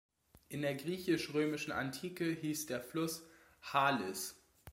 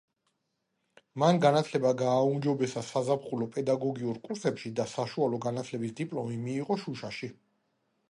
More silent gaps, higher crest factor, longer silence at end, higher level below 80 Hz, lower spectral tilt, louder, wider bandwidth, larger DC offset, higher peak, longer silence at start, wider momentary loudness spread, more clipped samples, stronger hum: neither; about the same, 22 dB vs 22 dB; second, 0 s vs 0.75 s; about the same, -72 dBFS vs -74 dBFS; second, -4.5 dB/octave vs -6.5 dB/octave; second, -38 LUFS vs -30 LUFS; first, 16.5 kHz vs 11.5 kHz; neither; second, -16 dBFS vs -10 dBFS; second, 0.5 s vs 1.15 s; about the same, 10 LU vs 10 LU; neither; neither